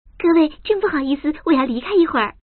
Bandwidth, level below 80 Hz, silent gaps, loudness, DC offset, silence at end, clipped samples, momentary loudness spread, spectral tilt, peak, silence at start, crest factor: 4.5 kHz; -46 dBFS; none; -18 LUFS; under 0.1%; 0.15 s; under 0.1%; 5 LU; -2.5 dB/octave; -4 dBFS; 0.2 s; 14 dB